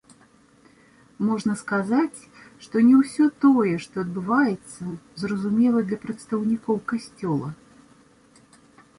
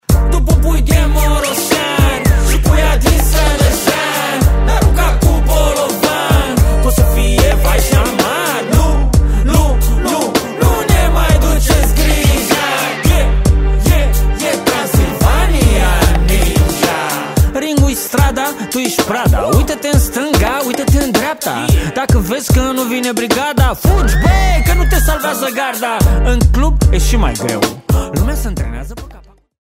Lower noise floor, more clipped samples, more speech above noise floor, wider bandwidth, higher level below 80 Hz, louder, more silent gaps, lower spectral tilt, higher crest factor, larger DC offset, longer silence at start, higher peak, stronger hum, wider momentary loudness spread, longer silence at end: first, -56 dBFS vs -38 dBFS; neither; first, 34 dB vs 25 dB; second, 11 kHz vs 16.5 kHz; second, -64 dBFS vs -14 dBFS; second, -23 LUFS vs -13 LUFS; neither; first, -7 dB/octave vs -5 dB/octave; about the same, 16 dB vs 12 dB; neither; first, 1.2 s vs 0.1 s; second, -8 dBFS vs 0 dBFS; neither; first, 14 LU vs 4 LU; first, 1.45 s vs 0.45 s